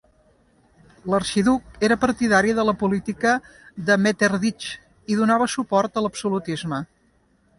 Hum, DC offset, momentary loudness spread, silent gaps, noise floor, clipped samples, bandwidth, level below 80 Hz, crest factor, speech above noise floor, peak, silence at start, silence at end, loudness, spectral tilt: none; under 0.1%; 12 LU; none; -62 dBFS; under 0.1%; 11.5 kHz; -52 dBFS; 18 dB; 41 dB; -4 dBFS; 1.05 s; 0.75 s; -21 LUFS; -5 dB/octave